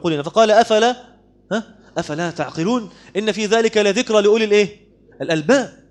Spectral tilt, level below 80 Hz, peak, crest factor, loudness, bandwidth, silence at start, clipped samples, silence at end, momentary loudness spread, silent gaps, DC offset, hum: -4.5 dB/octave; -58 dBFS; 0 dBFS; 16 dB; -17 LUFS; 10 kHz; 0.05 s; under 0.1%; 0.2 s; 12 LU; none; under 0.1%; none